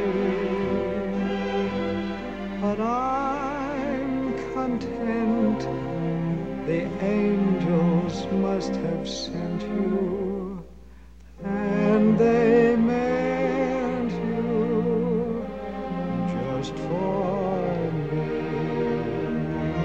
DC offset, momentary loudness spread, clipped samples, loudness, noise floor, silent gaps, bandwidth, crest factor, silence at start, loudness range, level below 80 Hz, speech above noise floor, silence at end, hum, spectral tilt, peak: 0.4%; 8 LU; under 0.1%; -25 LUFS; -47 dBFS; none; 8 kHz; 16 dB; 0 s; 5 LU; -46 dBFS; 21 dB; 0 s; none; -7.5 dB/octave; -8 dBFS